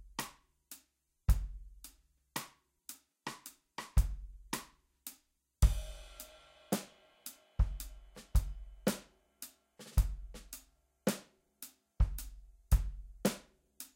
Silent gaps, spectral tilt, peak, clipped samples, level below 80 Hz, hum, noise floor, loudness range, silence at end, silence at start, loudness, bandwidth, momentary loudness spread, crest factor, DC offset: none; -5 dB/octave; -14 dBFS; under 0.1%; -38 dBFS; none; -74 dBFS; 4 LU; 0.1 s; 0.05 s; -39 LUFS; 16.5 kHz; 18 LU; 24 dB; under 0.1%